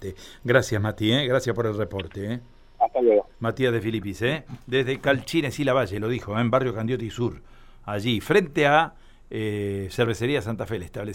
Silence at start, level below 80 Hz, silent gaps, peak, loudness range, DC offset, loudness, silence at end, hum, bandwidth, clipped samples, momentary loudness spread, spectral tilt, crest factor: 0 s; -48 dBFS; none; -4 dBFS; 2 LU; under 0.1%; -24 LUFS; 0 s; none; 16.5 kHz; under 0.1%; 11 LU; -6 dB/octave; 20 dB